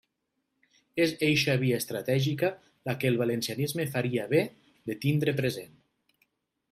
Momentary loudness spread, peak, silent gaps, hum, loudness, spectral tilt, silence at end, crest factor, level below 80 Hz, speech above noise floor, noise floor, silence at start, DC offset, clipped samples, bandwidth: 12 LU; -12 dBFS; none; none; -28 LUFS; -5.5 dB/octave; 1.05 s; 18 dB; -68 dBFS; 53 dB; -81 dBFS; 0.95 s; under 0.1%; under 0.1%; 16 kHz